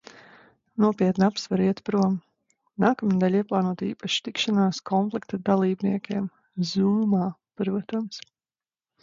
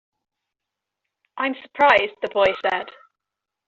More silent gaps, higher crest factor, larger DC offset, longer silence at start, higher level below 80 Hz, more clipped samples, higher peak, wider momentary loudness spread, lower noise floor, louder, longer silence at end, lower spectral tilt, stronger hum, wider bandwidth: neither; about the same, 18 dB vs 22 dB; neither; second, 0.75 s vs 1.35 s; about the same, -66 dBFS vs -62 dBFS; neither; second, -6 dBFS vs -2 dBFS; about the same, 9 LU vs 11 LU; first, under -90 dBFS vs -85 dBFS; second, -25 LUFS vs -20 LUFS; about the same, 0.85 s vs 0.75 s; first, -6.5 dB/octave vs 0 dB/octave; neither; about the same, 7.6 kHz vs 7.2 kHz